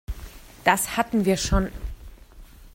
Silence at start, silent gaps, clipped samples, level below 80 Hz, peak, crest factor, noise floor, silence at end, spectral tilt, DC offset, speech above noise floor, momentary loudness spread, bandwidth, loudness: 0.1 s; none; under 0.1%; -34 dBFS; -4 dBFS; 22 dB; -46 dBFS; 0.05 s; -4 dB/octave; under 0.1%; 24 dB; 19 LU; 16.5 kHz; -23 LUFS